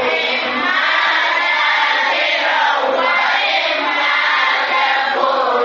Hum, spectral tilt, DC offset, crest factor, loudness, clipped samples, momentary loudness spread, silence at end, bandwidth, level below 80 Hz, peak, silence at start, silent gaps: none; 3.5 dB/octave; under 0.1%; 14 dB; -14 LUFS; under 0.1%; 2 LU; 0 s; 7.4 kHz; -72 dBFS; -2 dBFS; 0 s; none